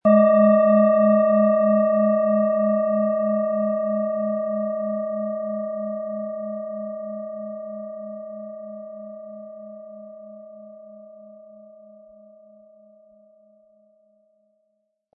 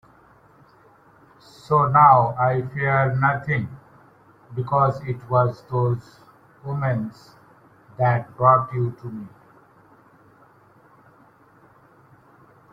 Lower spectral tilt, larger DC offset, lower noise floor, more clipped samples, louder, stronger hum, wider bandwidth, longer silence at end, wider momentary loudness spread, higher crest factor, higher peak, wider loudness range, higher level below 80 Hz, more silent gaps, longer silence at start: first, -13 dB/octave vs -9 dB/octave; neither; first, -73 dBFS vs -54 dBFS; neither; about the same, -21 LUFS vs -20 LUFS; neither; second, 3.8 kHz vs 7.4 kHz; first, 3.8 s vs 3.45 s; first, 24 LU vs 20 LU; second, 16 dB vs 22 dB; second, -6 dBFS vs -2 dBFS; first, 23 LU vs 6 LU; second, -80 dBFS vs -56 dBFS; neither; second, 0.05 s vs 1.7 s